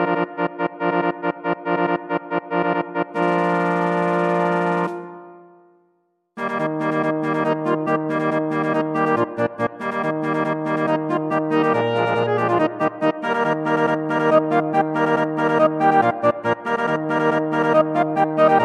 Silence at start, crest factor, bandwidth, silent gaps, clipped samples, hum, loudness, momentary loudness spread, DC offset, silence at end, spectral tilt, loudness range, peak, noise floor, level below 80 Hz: 0 s; 18 dB; 10.5 kHz; none; under 0.1%; none; -20 LUFS; 7 LU; under 0.1%; 0 s; -7.5 dB/octave; 5 LU; -2 dBFS; -66 dBFS; -70 dBFS